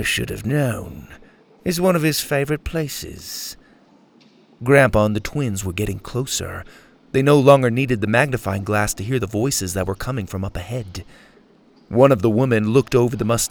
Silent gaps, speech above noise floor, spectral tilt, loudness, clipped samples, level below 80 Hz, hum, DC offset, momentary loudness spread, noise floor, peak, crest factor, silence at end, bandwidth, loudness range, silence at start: none; 33 dB; -5 dB/octave; -19 LUFS; under 0.1%; -42 dBFS; none; under 0.1%; 15 LU; -52 dBFS; 0 dBFS; 20 dB; 0 s; over 20 kHz; 5 LU; 0 s